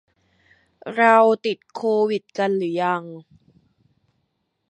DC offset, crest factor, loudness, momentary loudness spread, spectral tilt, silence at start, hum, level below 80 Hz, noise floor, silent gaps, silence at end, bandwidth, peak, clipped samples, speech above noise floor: under 0.1%; 22 dB; -20 LUFS; 15 LU; -6 dB/octave; 0.85 s; none; -74 dBFS; -73 dBFS; none; 1.5 s; 8.8 kHz; -2 dBFS; under 0.1%; 53 dB